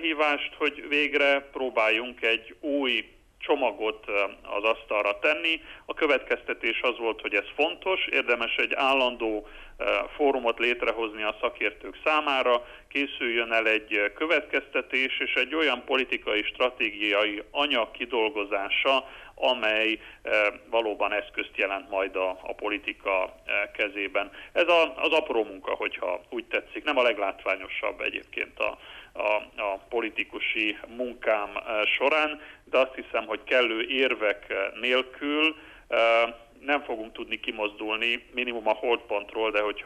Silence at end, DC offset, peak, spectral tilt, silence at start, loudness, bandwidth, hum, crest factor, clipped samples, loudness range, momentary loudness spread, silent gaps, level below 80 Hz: 0 s; under 0.1%; -10 dBFS; -3 dB/octave; 0 s; -26 LUFS; 13 kHz; none; 16 dB; under 0.1%; 3 LU; 8 LU; none; -58 dBFS